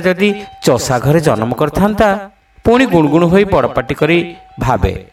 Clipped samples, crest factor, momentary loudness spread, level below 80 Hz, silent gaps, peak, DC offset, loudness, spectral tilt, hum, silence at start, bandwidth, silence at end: under 0.1%; 12 dB; 7 LU; -32 dBFS; none; 0 dBFS; under 0.1%; -13 LUFS; -6 dB/octave; none; 0 s; 16.5 kHz; 0.1 s